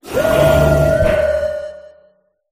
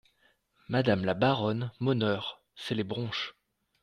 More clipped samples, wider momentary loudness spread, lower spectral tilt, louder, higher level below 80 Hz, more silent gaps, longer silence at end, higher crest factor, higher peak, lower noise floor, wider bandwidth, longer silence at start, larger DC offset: neither; first, 12 LU vs 9 LU; about the same, -6.5 dB/octave vs -7 dB/octave; first, -14 LUFS vs -30 LUFS; first, -28 dBFS vs -66 dBFS; neither; first, 0.7 s vs 0.5 s; second, 14 dB vs 20 dB; first, 0 dBFS vs -12 dBFS; second, -55 dBFS vs -69 dBFS; first, 15.5 kHz vs 11 kHz; second, 0.05 s vs 0.7 s; neither